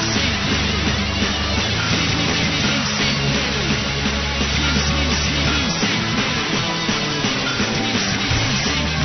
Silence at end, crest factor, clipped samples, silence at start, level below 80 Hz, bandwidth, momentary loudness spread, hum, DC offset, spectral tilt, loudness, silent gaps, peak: 0 s; 14 dB; under 0.1%; 0 s; -30 dBFS; 6.4 kHz; 2 LU; none; under 0.1%; -3.5 dB/octave; -18 LUFS; none; -6 dBFS